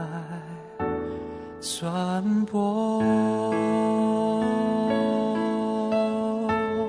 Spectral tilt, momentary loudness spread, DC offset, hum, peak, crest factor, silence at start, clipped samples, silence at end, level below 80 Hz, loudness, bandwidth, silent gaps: -6 dB/octave; 11 LU; under 0.1%; none; -12 dBFS; 14 dB; 0 s; under 0.1%; 0 s; -56 dBFS; -25 LUFS; 11 kHz; none